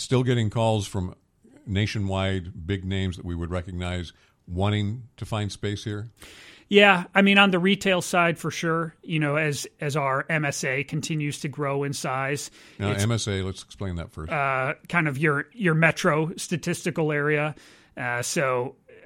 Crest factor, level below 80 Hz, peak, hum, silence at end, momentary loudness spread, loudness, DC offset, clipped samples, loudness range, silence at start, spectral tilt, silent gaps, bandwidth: 22 dB; -52 dBFS; -2 dBFS; none; 0.1 s; 14 LU; -25 LUFS; under 0.1%; under 0.1%; 9 LU; 0 s; -5 dB/octave; none; 16.5 kHz